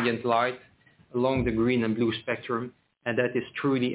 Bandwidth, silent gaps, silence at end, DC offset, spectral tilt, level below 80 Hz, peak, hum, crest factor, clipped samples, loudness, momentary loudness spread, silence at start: 4 kHz; none; 0 s; under 0.1%; -4.5 dB/octave; -50 dBFS; -12 dBFS; none; 16 dB; under 0.1%; -27 LUFS; 9 LU; 0 s